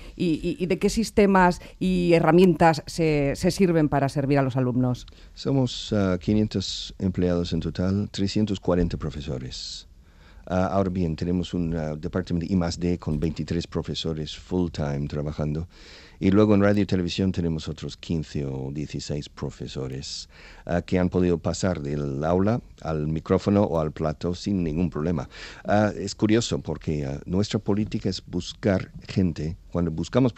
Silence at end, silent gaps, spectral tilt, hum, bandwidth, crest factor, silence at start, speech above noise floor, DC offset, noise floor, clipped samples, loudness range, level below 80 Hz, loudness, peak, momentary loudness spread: 0.05 s; none; -6.5 dB/octave; none; 13 kHz; 20 dB; 0 s; 25 dB; under 0.1%; -49 dBFS; under 0.1%; 7 LU; -44 dBFS; -25 LUFS; -6 dBFS; 12 LU